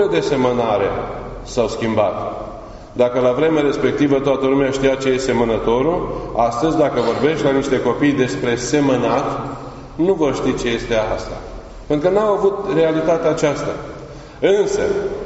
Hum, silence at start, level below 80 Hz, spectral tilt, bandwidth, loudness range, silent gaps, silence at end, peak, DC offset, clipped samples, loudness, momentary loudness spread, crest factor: none; 0 s; -38 dBFS; -5 dB/octave; 8 kHz; 2 LU; none; 0 s; -2 dBFS; under 0.1%; under 0.1%; -18 LUFS; 13 LU; 16 dB